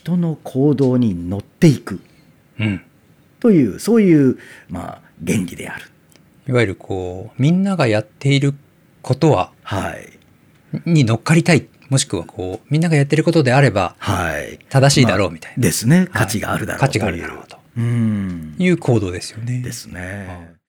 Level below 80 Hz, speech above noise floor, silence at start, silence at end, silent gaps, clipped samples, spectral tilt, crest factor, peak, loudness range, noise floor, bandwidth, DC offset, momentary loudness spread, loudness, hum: -48 dBFS; 35 dB; 0.05 s; 0.2 s; none; under 0.1%; -6 dB/octave; 18 dB; 0 dBFS; 4 LU; -52 dBFS; 19 kHz; under 0.1%; 16 LU; -17 LUFS; none